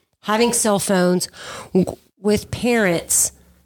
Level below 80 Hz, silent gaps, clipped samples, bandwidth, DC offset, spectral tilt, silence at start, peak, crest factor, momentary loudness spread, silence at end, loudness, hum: -48 dBFS; none; under 0.1%; 19 kHz; under 0.1%; -3.5 dB/octave; 0.25 s; -4 dBFS; 16 dB; 9 LU; 0.35 s; -19 LUFS; none